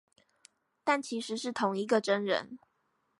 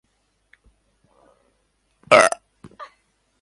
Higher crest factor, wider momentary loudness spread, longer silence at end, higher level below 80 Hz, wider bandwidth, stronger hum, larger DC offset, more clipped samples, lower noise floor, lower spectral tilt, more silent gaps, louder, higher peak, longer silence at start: about the same, 20 dB vs 24 dB; second, 8 LU vs 28 LU; about the same, 0.65 s vs 0.55 s; second, -82 dBFS vs -64 dBFS; about the same, 11.5 kHz vs 11.5 kHz; neither; neither; neither; first, -77 dBFS vs -68 dBFS; first, -4 dB/octave vs -2 dB/octave; neither; second, -31 LUFS vs -16 LUFS; second, -14 dBFS vs 0 dBFS; second, 0.85 s vs 2.1 s